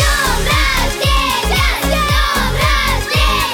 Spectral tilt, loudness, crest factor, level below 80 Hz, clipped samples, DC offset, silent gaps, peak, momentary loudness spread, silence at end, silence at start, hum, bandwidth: -3 dB/octave; -14 LUFS; 12 dB; -18 dBFS; under 0.1%; under 0.1%; none; -2 dBFS; 2 LU; 0 s; 0 s; none; 19 kHz